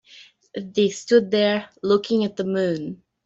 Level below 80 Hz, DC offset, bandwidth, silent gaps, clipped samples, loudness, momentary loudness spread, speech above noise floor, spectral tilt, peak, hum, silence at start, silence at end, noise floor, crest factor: -64 dBFS; under 0.1%; 8 kHz; none; under 0.1%; -22 LUFS; 14 LU; 29 dB; -5.5 dB/octave; -4 dBFS; none; 0.15 s; 0.3 s; -50 dBFS; 18 dB